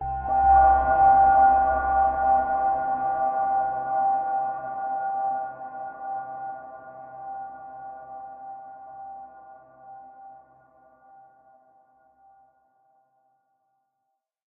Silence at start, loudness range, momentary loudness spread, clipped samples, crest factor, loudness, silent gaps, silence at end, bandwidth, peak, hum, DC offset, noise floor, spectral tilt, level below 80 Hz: 0 s; 24 LU; 24 LU; under 0.1%; 18 dB; -22 LUFS; none; 4.15 s; 2.8 kHz; -8 dBFS; none; under 0.1%; -80 dBFS; -6.5 dB/octave; -46 dBFS